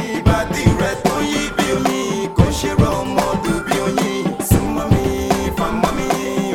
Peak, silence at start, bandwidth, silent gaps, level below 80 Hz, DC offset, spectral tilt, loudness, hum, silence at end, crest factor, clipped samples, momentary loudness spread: 0 dBFS; 0 s; 19 kHz; none; -30 dBFS; under 0.1%; -5.5 dB/octave; -18 LUFS; none; 0 s; 18 dB; under 0.1%; 3 LU